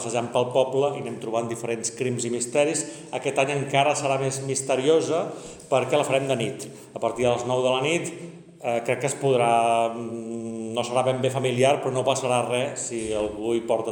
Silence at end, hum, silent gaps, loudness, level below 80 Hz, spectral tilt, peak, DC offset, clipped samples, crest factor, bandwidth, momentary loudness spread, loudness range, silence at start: 0 s; none; none; -24 LUFS; -62 dBFS; -4 dB/octave; -6 dBFS; under 0.1%; under 0.1%; 18 dB; 18 kHz; 11 LU; 2 LU; 0 s